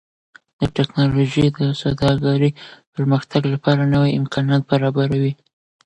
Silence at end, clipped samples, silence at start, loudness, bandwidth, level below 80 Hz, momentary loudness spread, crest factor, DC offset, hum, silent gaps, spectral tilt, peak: 0.5 s; under 0.1%; 0.6 s; -18 LUFS; 8.6 kHz; -44 dBFS; 7 LU; 16 dB; under 0.1%; none; 2.87-2.93 s; -7.5 dB/octave; -2 dBFS